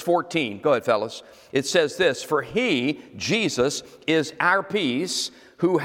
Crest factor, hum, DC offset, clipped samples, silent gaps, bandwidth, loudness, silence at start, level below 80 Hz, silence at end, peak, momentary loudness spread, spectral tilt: 18 dB; none; under 0.1%; under 0.1%; none; 17 kHz; -23 LUFS; 0 s; -62 dBFS; 0 s; -6 dBFS; 7 LU; -4 dB/octave